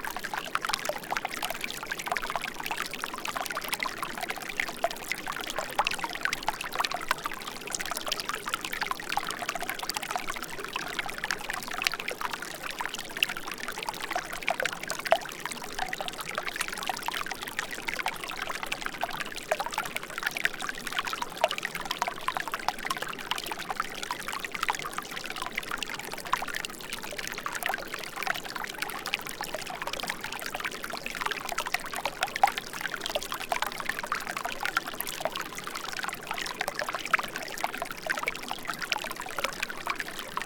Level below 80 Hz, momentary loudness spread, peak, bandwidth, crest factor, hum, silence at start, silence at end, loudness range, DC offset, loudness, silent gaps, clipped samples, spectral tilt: -54 dBFS; 6 LU; -2 dBFS; 19 kHz; 30 dB; none; 0 s; 0 s; 2 LU; under 0.1%; -32 LUFS; none; under 0.1%; -1 dB/octave